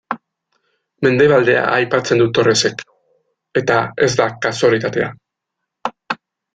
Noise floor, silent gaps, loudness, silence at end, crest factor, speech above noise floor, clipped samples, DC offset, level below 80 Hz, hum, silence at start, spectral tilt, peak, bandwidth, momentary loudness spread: -79 dBFS; none; -16 LUFS; 0.4 s; 16 dB; 64 dB; under 0.1%; under 0.1%; -56 dBFS; none; 0.1 s; -4.5 dB/octave; -2 dBFS; 9.4 kHz; 16 LU